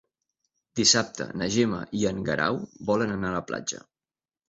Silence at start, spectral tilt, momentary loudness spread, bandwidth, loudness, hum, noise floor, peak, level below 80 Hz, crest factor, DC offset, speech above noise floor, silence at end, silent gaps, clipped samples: 0.75 s; -3 dB/octave; 12 LU; 8.2 kHz; -26 LUFS; none; under -90 dBFS; -6 dBFS; -56 dBFS; 22 dB; under 0.1%; over 64 dB; 0.7 s; none; under 0.1%